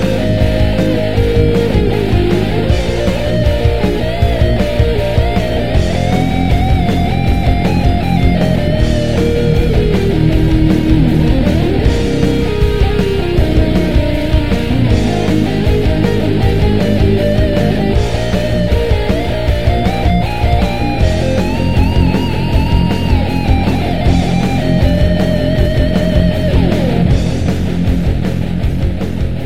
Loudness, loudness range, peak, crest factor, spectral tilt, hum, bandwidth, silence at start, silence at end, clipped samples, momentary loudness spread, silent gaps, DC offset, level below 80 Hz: -13 LUFS; 2 LU; 0 dBFS; 12 dB; -7.5 dB/octave; none; 15.5 kHz; 0 s; 0 s; under 0.1%; 3 LU; none; 6%; -18 dBFS